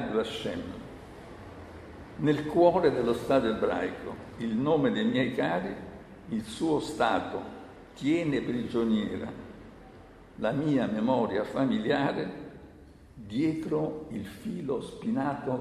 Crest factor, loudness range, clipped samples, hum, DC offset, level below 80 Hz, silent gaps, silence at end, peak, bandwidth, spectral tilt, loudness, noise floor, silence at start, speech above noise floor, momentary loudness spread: 20 dB; 5 LU; under 0.1%; none; under 0.1%; -56 dBFS; none; 0 s; -8 dBFS; 13.5 kHz; -6.5 dB/octave; -29 LUFS; -52 dBFS; 0 s; 23 dB; 20 LU